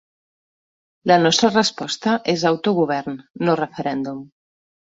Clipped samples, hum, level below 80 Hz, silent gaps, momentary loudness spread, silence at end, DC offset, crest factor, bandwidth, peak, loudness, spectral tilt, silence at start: under 0.1%; none; -62 dBFS; 3.30-3.34 s; 12 LU; 0.7 s; under 0.1%; 20 dB; 8 kHz; -2 dBFS; -19 LUFS; -4.5 dB/octave; 1.05 s